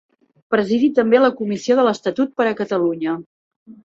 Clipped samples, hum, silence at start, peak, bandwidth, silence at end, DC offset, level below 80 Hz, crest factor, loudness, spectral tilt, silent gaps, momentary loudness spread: under 0.1%; none; 0.5 s; -2 dBFS; 7.8 kHz; 0.2 s; under 0.1%; -64 dBFS; 16 dB; -18 LUFS; -6 dB/octave; 3.26-3.66 s; 9 LU